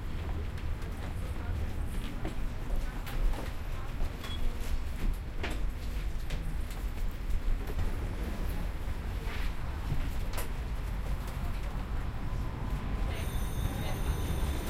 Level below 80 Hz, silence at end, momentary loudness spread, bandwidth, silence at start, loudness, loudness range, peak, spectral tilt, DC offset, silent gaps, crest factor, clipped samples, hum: -34 dBFS; 0 s; 4 LU; 15.5 kHz; 0 s; -38 LUFS; 2 LU; -18 dBFS; -5.5 dB/octave; under 0.1%; none; 14 dB; under 0.1%; none